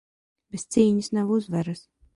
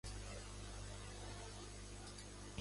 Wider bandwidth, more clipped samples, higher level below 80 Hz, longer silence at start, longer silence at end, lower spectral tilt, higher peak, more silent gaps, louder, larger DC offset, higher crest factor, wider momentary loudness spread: about the same, 11.5 kHz vs 11.5 kHz; neither; about the same, -60 dBFS vs -56 dBFS; first, 0.55 s vs 0.05 s; first, 0.35 s vs 0 s; first, -6.5 dB/octave vs -3.5 dB/octave; first, -8 dBFS vs -32 dBFS; neither; first, -24 LUFS vs -52 LUFS; neither; about the same, 18 dB vs 18 dB; first, 17 LU vs 2 LU